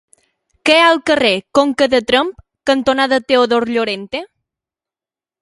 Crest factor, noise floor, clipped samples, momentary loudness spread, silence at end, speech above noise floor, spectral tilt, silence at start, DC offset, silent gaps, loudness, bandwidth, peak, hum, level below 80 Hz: 16 dB; under -90 dBFS; under 0.1%; 12 LU; 1.15 s; over 76 dB; -3.5 dB/octave; 0.65 s; under 0.1%; none; -14 LUFS; 11.5 kHz; 0 dBFS; none; -52 dBFS